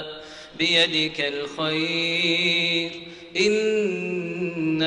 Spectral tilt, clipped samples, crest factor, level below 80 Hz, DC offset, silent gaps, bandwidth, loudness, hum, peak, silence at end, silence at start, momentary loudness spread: -4 dB/octave; under 0.1%; 16 dB; -62 dBFS; under 0.1%; none; 10.5 kHz; -22 LUFS; none; -8 dBFS; 0 s; 0 s; 12 LU